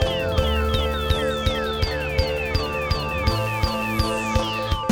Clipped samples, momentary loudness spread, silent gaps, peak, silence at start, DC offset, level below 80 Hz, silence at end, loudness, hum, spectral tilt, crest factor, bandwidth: under 0.1%; 2 LU; none; -6 dBFS; 0 s; under 0.1%; -28 dBFS; 0 s; -23 LUFS; none; -5.5 dB/octave; 16 dB; 17.5 kHz